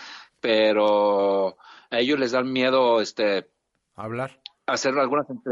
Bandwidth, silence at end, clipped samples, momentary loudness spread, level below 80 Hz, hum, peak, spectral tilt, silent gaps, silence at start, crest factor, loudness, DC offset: 7.8 kHz; 0 s; under 0.1%; 13 LU; -72 dBFS; none; -10 dBFS; -4 dB/octave; none; 0 s; 14 dB; -22 LUFS; under 0.1%